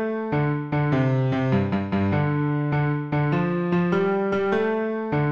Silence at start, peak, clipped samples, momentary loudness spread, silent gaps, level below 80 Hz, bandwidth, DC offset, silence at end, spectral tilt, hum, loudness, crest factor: 0 s; -10 dBFS; under 0.1%; 3 LU; none; -54 dBFS; 6.6 kHz; under 0.1%; 0 s; -9.5 dB/octave; none; -23 LUFS; 12 dB